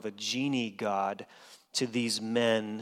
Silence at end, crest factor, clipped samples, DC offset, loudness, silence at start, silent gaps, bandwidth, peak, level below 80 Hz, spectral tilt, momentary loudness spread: 0 s; 18 dB; under 0.1%; under 0.1%; -31 LUFS; 0.05 s; none; 16 kHz; -14 dBFS; -80 dBFS; -3.5 dB/octave; 8 LU